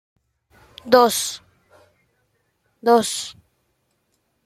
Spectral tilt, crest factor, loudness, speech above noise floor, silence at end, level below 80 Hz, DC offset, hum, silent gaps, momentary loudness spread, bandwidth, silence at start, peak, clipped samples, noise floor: -2.5 dB/octave; 22 dB; -18 LUFS; 52 dB; 1.15 s; -66 dBFS; under 0.1%; none; none; 20 LU; 15.5 kHz; 0.85 s; -2 dBFS; under 0.1%; -70 dBFS